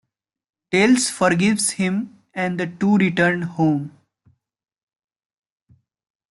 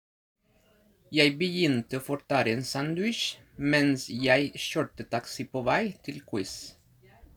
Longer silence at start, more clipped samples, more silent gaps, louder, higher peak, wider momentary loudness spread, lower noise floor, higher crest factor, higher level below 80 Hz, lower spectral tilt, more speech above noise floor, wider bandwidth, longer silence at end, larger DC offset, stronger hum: second, 0.7 s vs 1.1 s; neither; neither; first, -19 LUFS vs -28 LUFS; first, -4 dBFS vs -8 dBFS; about the same, 10 LU vs 11 LU; second, -61 dBFS vs -65 dBFS; about the same, 18 dB vs 22 dB; about the same, -62 dBFS vs -62 dBFS; about the same, -4.5 dB/octave vs -4.5 dB/octave; first, 42 dB vs 36 dB; second, 12 kHz vs over 20 kHz; first, 2.45 s vs 0.65 s; neither; neither